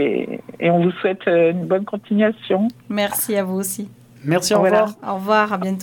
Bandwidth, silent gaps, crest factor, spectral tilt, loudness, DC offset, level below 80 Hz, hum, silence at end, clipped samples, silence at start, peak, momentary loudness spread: 19 kHz; none; 16 dB; -5 dB/octave; -19 LUFS; under 0.1%; -66 dBFS; none; 0 s; under 0.1%; 0 s; -2 dBFS; 9 LU